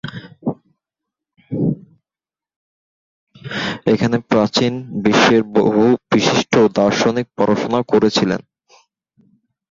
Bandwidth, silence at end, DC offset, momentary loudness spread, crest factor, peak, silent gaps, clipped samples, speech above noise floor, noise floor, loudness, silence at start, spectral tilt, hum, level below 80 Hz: 7.6 kHz; 1.35 s; under 0.1%; 13 LU; 16 dB; -2 dBFS; 2.56-3.27 s; under 0.1%; over 75 dB; under -90 dBFS; -16 LUFS; 0.05 s; -5.5 dB/octave; none; -54 dBFS